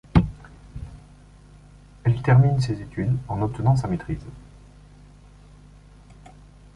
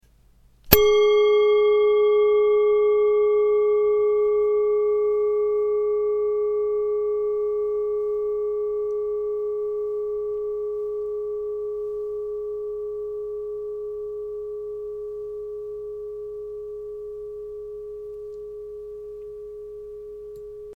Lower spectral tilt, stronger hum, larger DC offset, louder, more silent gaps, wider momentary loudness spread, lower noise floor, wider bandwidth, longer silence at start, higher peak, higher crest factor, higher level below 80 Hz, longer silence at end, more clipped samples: first, -8.5 dB/octave vs -4.5 dB/octave; first, 50 Hz at -40 dBFS vs none; neither; about the same, -23 LUFS vs -23 LUFS; neither; first, 24 LU vs 18 LU; second, -48 dBFS vs -56 dBFS; second, 10.5 kHz vs 17 kHz; second, 0.15 s vs 0.65 s; about the same, -2 dBFS vs 0 dBFS; about the same, 22 dB vs 24 dB; first, -40 dBFS vs -48 dBFS; first, 2.35 s vs 0 s; neither